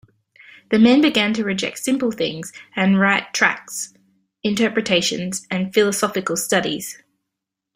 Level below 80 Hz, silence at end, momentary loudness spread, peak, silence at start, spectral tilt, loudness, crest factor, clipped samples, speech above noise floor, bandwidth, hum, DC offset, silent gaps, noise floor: -60 dBFS; 0.8 s; 13 LU; -2 dBFS; 0.7 s; -4 dB/octave; -19 LUFS; 20 dB; under 0.1%; 63 dB; 16 kHz; none; under 0.1%; none; -82 dBFS